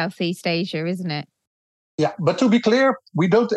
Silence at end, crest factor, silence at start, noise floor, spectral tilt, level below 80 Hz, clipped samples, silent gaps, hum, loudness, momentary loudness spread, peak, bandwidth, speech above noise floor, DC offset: 0 s; 16 dB; 0 s; under -90 dBFS; -6.5 dB/octave; -68 dBFS; under 0.1%; 1.47-1.98 s; none; -21 LUFS; 10 LU; -4 dBFS; 12.5 kHz; over 70 dB; under 0.1%